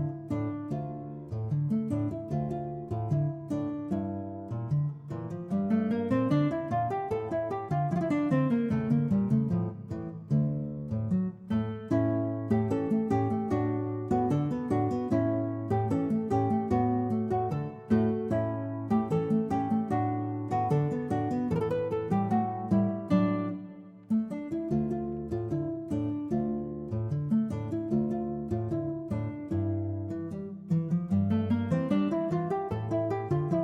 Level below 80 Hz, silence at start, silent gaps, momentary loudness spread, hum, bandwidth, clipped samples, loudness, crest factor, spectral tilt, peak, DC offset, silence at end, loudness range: -58 dBFS; 0 s; none; 7 LU; none; 8.8 kHz; under 0.1%; -30 LUFS; 16 dB; -10 dB/octave; -14 dBFS; under 0.1%; 0 s; 4 LU